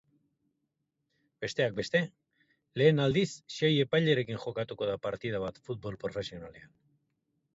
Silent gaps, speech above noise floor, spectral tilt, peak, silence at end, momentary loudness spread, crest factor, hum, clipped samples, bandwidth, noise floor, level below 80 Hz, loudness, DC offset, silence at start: none; 52 dB; -6 dB/octave; -12 dBFS; 0.9 s; 14 LU; 20 dB; none; under 0.1%; 8 kHz; -82 dBFS; -64 dBFS; -31 LUFS; under 0.1%; 1.4 s